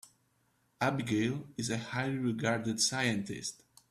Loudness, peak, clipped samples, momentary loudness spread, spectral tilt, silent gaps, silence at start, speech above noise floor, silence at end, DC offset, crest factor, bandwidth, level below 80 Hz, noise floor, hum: -33 LUFS; -16 dBFS; under 0.1%; 8 LU; -4 dB/octave; none; 0.8 s; 41 dB; 0.35 s; under 0.1%; 18 dB; 14.5 kHz; -68 dBFS; -74 dBFS; none